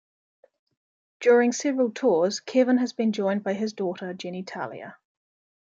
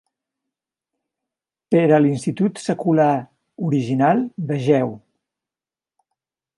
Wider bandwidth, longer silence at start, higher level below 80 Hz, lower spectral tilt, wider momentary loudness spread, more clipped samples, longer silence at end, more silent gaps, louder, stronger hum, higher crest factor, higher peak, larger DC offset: second, 7.8 kHz vs 11.5 kHz; second, 1.2 s vs 1.7 s; second, -78 dBFS vs -68 dBFS; second, -5 dB/octave vs -7.5 dB/octave; first, 14 LU vs 9 LU; neither; second, 0.75 s vs 1.6 s; neither; second, -25 LUFS vs -19 LUFS; neither; about the same, 18 dB vs 18 dB; second, -8 dBFS vs -4 dBFS; neither